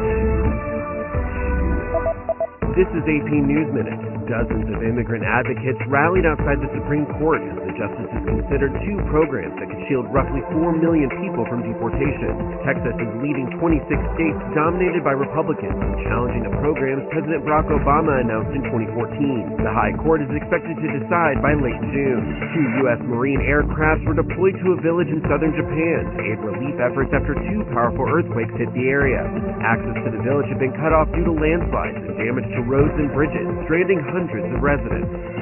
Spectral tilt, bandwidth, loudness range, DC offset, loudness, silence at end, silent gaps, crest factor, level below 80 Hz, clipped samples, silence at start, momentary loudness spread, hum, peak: -7.5 dB/octave; 3.2 kHz; 2 LU; under 0.1%; -21 LUFS; 0 s; none; 18 dB; -30 dBFS; under 0.1%; 0 s; 6 LU; none; -2 dBFS